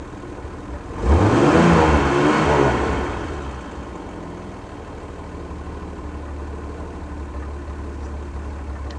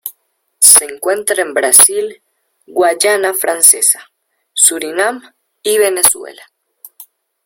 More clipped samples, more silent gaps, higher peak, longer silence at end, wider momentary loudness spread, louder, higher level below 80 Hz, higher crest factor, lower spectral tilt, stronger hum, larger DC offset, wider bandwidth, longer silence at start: second, under 0.1% vs 0.9%; neither; about the same, -2 dBFS vs 0 dBFS; second, 0 s vs 0.4 s; first, 19 LU vs 16 LU; second, -19 LUFS vs -10 LUFS; first, -30 dBFS vs -58 dBFS; about the same, 18 dB vs 14 dB; first, -6.5 dB/octave vs 0.5 dB/octave; neither; neither; second, 10 kHz vs over 20 kHz; about the same, 0 s vs 0.05 s